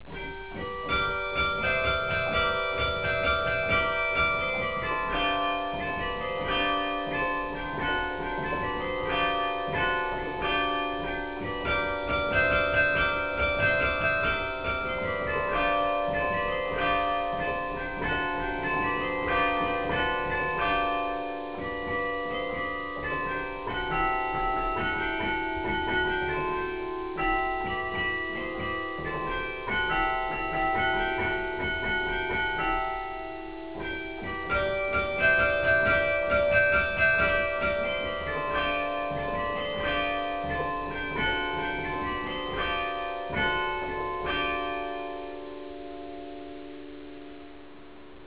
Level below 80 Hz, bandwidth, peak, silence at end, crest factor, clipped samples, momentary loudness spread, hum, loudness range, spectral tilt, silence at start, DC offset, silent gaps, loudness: -44 dBFS; 4 kHz; -12 dBFS; 0 s; 18 dB; under 0.1%; 10 LU; none; 5 LU; -2 dB/octave; 0 s; 0.4%; none; -28 LUFS